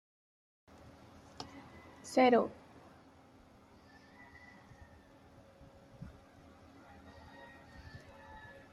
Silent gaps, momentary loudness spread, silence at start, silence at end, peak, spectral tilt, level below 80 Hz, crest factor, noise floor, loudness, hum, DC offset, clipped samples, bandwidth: none; 29 LU; 1.4 s; 0.35 s; -16 dBFS; -5 dB/octave; -68 dBFS; 24 dB; -61 dBFS; -32 LUFS; none; under 0.1%; under 0.1%; 13 kHz